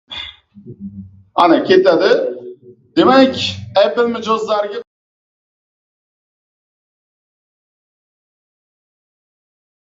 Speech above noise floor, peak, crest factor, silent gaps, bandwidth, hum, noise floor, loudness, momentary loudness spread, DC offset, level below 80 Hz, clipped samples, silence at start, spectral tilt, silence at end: 23 dB; 0 dBFS; 18 dB; none; 7.8 kHz; none; -36 dBFS; -14 LUFS; 21 LU; under 0.1%; -54 dBFS; under 0.1%; 0.1 s; -5.5 dB/octave; 5.05 s